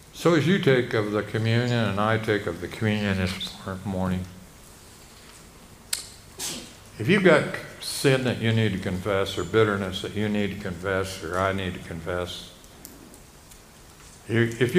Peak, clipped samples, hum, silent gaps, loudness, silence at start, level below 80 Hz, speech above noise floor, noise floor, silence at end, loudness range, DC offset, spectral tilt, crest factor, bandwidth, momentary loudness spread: -4 dBFS; under 0.1%; none; none; -25 LUFS; 0 s; -52 dBFS; 25 dB; -49 dBFS; 0 s; 9 LU; under 0.1%; -5.5 dB/octave; 22 dB; 15.5 kHz; 17 LU